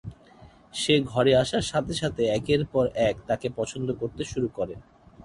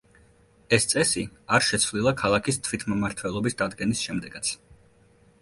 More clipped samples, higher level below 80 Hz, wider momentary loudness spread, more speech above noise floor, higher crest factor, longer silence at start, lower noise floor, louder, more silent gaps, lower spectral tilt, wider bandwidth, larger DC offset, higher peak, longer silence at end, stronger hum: neither; about the same, -50 dBFS vs -52 dBFS; first, 11 LU vs 8 LU; second, 27 dB vs 33 dB; about the same, 18 dB vs 22 dB; second, 0.05 s vs 0.7 s; second, -52 dBFS vs -58 dBFS; about the same, -26 LUFS vs -25 LUFS; neither; first, -5 dB/octave vs -3.5 dB/octave; about the same, 11.5 kHz vs 12 kHz; neither; second, -8 dBFS vs -4 dBFS; second, 0 s vs 0.85 s; neither